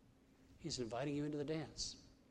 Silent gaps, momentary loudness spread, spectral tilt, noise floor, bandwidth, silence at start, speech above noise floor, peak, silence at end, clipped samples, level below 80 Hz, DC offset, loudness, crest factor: none; 7 LU; -4.5 dB/octave; -68 dBFS; 11.5 kHz; 0.4 s; 25 dB; -30 dBFS; 0.15 s; under 0.1%; -66 dBFS; under 0.1%; -44 LUFS; 16 dB